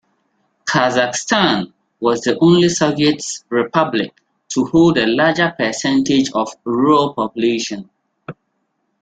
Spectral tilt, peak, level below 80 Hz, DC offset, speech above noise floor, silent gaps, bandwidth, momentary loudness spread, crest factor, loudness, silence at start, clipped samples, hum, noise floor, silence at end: -4.5 dB/octave; -2 dBFS; -54 dBFS; under 0.1%; 53 dB; none; 9.2 kHz; 11 LU; 16 dB; -16 LUFS; 0.65 s; under 0.1%; none; -69 dBFS; 0.7 s